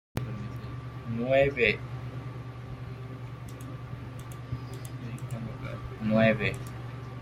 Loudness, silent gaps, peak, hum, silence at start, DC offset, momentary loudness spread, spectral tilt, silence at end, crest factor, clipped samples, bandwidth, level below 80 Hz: -32 LUFS; none; -10 dBFS; none; 0.15 s; under 0.1%; 17 LU; -7 dB/octave; 0 s; 22 dB; under 0.1%; 16 kHz; -50 dBFS